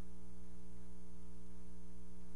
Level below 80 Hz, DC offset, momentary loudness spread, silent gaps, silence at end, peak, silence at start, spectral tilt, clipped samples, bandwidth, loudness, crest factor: -60 dBFS; 2%; 0 LU; none; 0 s; -34 dBFS; 0 s; -6.5 dB/octave; under 0.1%; 10.5 kHz; -58 LUFS; 8 dB